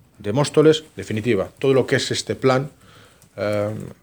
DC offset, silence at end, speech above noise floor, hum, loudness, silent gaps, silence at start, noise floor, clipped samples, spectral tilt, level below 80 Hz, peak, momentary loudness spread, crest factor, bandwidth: under 0.1%; 0.1 s; 29 dB; none; -20 LUFS; none; 0.2 s; -49 dBFS; under 0.1%; -5.5 dB/octave; -58 dBFS; -4 dBFS; 12 LU; 18 dB; over 20 kHz